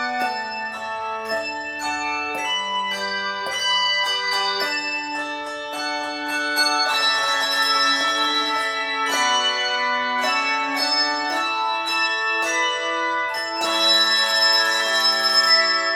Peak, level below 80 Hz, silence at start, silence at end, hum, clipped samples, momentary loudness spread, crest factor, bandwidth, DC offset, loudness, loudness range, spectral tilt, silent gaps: -6 dBFS; -66 dBFS; 0 s; 0 s; none; under 0.1%; 10 LU; 16 dB; 19.5 kHz; under 0.1%; -20 LUFS; 4 LU; 0.5 dB/octave; none